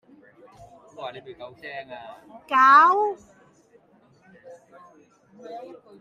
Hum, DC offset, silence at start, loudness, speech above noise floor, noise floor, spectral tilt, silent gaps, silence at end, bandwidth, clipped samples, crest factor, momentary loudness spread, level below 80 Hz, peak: none; under 0.1%; 1 s; -17 LUFS; 36 dB; -58 dBFS; -3.5 dB/octave; none; 0.35 s; 9 kHz; under 0.1%; 22 dB; 27 LU; -72 dBFS; -4 dBFS